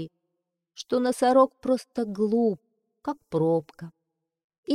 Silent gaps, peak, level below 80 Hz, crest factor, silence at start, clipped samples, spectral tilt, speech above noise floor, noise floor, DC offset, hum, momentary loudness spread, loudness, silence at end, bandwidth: 4.44-4.50 s, 4.58-4.63 s; -8 dBFS; -68 dBFS; 18 dB; 0 s; under 0.1%; -6.5 dB/octave; 57 dB; -81 dBFS; under 0.1%; none; 22 LU; -25 LUFS; 0 s; 13.5 kHz